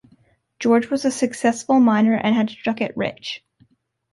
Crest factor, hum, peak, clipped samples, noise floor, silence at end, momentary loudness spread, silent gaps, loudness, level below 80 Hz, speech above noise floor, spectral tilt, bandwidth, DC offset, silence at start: 14 dB; none; -6 dBFS; under 0.1%; -60 dBFS; 0.75 s; 10 LU; none; -20 LUFS; -62 dBFS; 41 dB; -5 dB/octave; 11.5 kHz; under 0.1%; 0.6 s